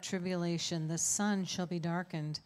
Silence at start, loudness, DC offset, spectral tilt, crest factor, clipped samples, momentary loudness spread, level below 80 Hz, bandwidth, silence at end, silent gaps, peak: 0 s; -34 LUFS; under 0.1%; -4 dB/octave; 16 dB; under 0.1%; 6 LU; -74 dBFS; 13.5 kHz; 0.05 s; none; -20 dBFS